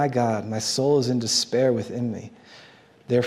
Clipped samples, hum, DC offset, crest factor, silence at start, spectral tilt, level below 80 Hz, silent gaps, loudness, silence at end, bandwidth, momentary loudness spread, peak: under 0.1%; none; under 0.1%; 16 dB; 0 s; -4.5 dB/octave; -68 dBFS; none; -23 LUFS; 0 s; 15.5 kHz; 9 LU; -8 dBFS